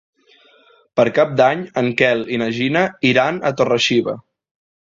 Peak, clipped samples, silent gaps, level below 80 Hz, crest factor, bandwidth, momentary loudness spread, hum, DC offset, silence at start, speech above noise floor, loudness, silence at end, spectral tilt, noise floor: 0 dBFS; under 0.1%; none; -58 dBFS; 18 dB; 7.8 kHz; 6 LU; none; under 0.1%; 0.95 s; 36 dB; -17 LUFS; 0.7 s; -5 dB/octave; -52 dBFS